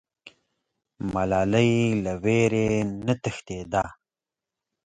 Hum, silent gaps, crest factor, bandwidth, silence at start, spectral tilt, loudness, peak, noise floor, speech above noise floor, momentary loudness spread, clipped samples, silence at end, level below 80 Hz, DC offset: none; none; 18 dB; 9.4 kHz; 0.25 s; -6.5 dB/octave; -24 LUFS; -8 dBFS; -90 dBFS; 66 dB; 11 LU; under 0.1%; 0.95 s; -50 dBFS; under 0.1%